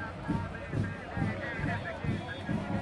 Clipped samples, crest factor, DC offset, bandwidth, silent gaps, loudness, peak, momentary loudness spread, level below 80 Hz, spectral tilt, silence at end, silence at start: under 0.1%; 16 dB; under 0.1%; 11.5 kHz; none; -35 LUFS; -18 dBFS; 2 LU; -50 dBFS; -7.5 dB/octave; 0 s; 0 s